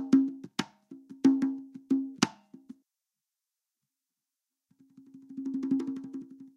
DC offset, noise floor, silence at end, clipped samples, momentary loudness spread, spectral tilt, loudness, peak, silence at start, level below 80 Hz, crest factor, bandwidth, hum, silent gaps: under 0.1%; -89 dBFS; 0.05 s; under 0.1%; 19 LU; -4.5 dB/octave; -31 LUFS; -6 dBFS; 0 s; -80 dBFS; 26 dB; 11 kHz; none; none